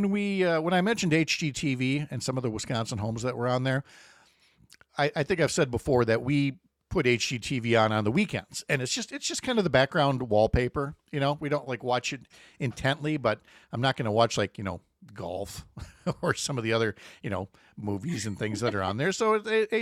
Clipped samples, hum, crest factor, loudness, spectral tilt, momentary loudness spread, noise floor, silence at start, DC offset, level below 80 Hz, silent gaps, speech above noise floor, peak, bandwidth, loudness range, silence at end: under 0.1%; none; 20 dB; -28 LUFS; -5 dB/octave; 11 LU; -62 dBFS; 0 s; under 0.1%; -52 dBFS; none; 34 dB; -8 dBFS; 14.5 kHz; 5 LU; 0 s